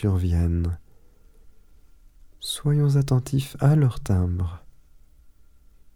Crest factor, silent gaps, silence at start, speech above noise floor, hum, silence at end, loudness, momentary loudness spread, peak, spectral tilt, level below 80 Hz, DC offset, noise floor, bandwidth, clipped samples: 20 dB; none; 0 s; 30 dB; none; 1.4 s; -23 LUFS; 12 LU; -6 dBFS; -7 dB/octave; -38 dBFS; under 0.1%; -51 dBFS; 15 kHz; under 0.1%